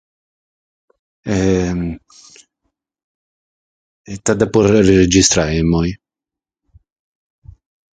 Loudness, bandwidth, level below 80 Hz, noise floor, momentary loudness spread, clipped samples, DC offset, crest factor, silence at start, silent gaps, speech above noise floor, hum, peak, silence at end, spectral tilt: -14 LUFS; 9.6 kHz; -36 dBFS; -88 dBFS; 20 LU; under 0.1%; under 0.1%; 18 dB; 1.25 s; 3.04-4.04 s; 73 dB; none; 0 dBFS; 2 s; -5 dB/octave